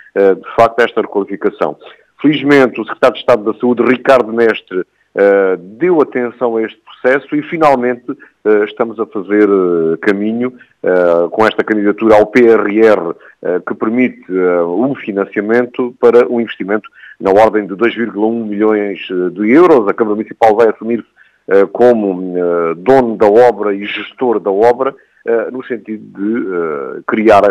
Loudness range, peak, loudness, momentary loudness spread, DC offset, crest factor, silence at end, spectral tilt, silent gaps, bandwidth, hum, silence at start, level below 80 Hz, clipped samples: 3 LU; 0 dBFS; -12 LUFS; 10 LU; under 0.1%; 12 dB; 0 s; -7 dB/octave; none; 9.2 kHz; none; 0.15 s; -52 dBFS; 0.5%